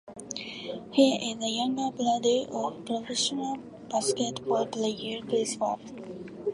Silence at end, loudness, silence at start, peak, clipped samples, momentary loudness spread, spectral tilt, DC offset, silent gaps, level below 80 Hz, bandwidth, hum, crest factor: 0 s; -29 LUFS; 0.05 s; -10 dBFS; under 0.1%; 13 LU; -3.5 dB/octave; under 0.1%; none; -68 dBFS; 11.5 kHz; none; 20 dB